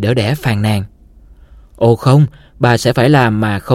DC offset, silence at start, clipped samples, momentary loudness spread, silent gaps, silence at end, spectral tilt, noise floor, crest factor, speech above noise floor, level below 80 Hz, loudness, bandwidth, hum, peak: under 0.1%; 0 s; under 0.1%; 7 LU; none; 0 s; -6.5 dB/octave; -41 dBFS; 14 dB; 29 dB; -40 dBFS; -13 LUFS; 15.5 kHz; none; 0 dBFS